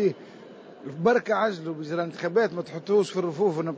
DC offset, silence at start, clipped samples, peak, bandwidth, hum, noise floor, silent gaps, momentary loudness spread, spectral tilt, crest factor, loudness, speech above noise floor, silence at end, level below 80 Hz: under 0.1%; 0 s; under 0.1%; -10 dBFS; 8 kHz; none; -46 dBFS; none; 19 LU; -6.5 dB/octave; 16 dB; -26 LUFS; 20 dB; 0 s; -74 dBFS